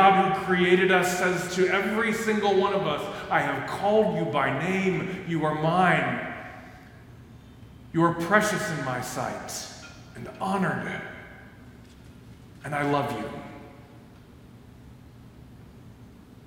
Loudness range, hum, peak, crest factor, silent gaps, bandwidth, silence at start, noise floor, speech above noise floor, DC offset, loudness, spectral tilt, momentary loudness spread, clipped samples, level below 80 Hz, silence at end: 10 LU; none; -4 dBFS; 22 dB; none; 17 kHz; 0 s; -49 dBFS; 24 dB; under 0.1%; -25 LUFS; -5 dB/octave; 20 LU; under 0.1%; -56 dBFS; 0 s